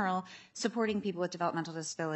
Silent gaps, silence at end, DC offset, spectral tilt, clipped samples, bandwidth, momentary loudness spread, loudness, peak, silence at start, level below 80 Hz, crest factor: none; 0 s; under 0.1%; -4.5 dB/octave; under 0.1%; 8.4 kHz; 5 LU; -35 LUFS; -18 dBFS; 0 s; -80 dBFS; 18 dB